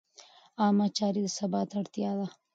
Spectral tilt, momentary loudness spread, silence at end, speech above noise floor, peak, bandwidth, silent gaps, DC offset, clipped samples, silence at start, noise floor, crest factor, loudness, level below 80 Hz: -5.5 dB/octave; 8 LU; 0.25 s; 28 dB; -14 dBFS; 8 kHz; none; under 0.1%; under 0.1%; 0.6 s; -57 dBFS; 16 dB; -30 LUFS; -78 dBFS